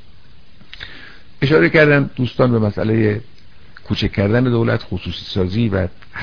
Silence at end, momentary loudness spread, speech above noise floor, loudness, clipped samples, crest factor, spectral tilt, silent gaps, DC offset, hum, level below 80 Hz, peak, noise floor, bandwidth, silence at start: 0 s; 14 LU; 31 dB; -17 LUFS; under 0.1%; 18 dB; -8 dB/octave; none; 2%; none; -40 dBFS; 0 dBFS; -47 dBFS; 5.4 kHz; 0.75 s